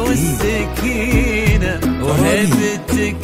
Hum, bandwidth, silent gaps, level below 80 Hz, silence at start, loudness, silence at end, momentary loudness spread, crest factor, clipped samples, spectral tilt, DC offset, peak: none; 16 kHz; none; -24 dBFS; 0 s; -16 LUFS; 0 s; 4 LU; 14 dB; under 0.1%; -5.5 dB/octave; under 0.1%; -2 dBFS